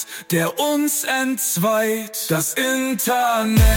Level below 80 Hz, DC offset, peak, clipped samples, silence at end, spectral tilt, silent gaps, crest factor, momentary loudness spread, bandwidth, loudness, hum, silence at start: -26 dBFS; under 0.1%; -6 dBFS; under 0.1%; 0 s; -4 dB/octave; none; 14 dB; 4 LU; 17 kHz; -19 LUFS; none; 0 s